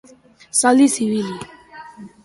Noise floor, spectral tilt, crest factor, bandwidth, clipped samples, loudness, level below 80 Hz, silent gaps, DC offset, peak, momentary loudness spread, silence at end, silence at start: -47 dBFS; -3.5 dB/octave; 18 dB; 11.5 kHz; under 0.1%; -17 LUFS; -60 dBFS; none; under 0.1%; -2 dBFS; 22 LU; 0.15 s; 0.55 s